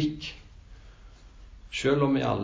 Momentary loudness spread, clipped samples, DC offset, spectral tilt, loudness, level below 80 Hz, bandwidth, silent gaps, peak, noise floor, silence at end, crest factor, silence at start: 16 LU; under 0.1%; under 0.1%; -6 dB/octave; -27 LUFS; -50 dBFS; 8 kHz; none; -12 dBFS; -50 dBFS; 0 s; 18 dB; 0 s